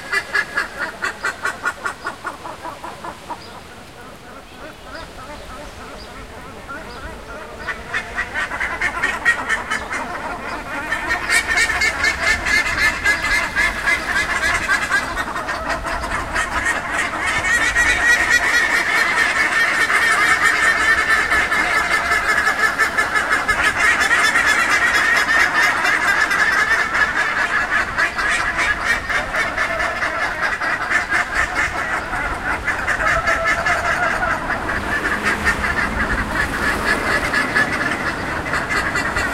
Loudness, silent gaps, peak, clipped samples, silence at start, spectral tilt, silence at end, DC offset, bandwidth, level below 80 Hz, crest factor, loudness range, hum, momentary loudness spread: -17 LUFS; none; -2 dBFS; under 0.1%; 0 s; -2 dB/octave; 0 s; 0.4%; 16 kHz; -36 dBFS; 18 dB; 15 LU; none; 19 LU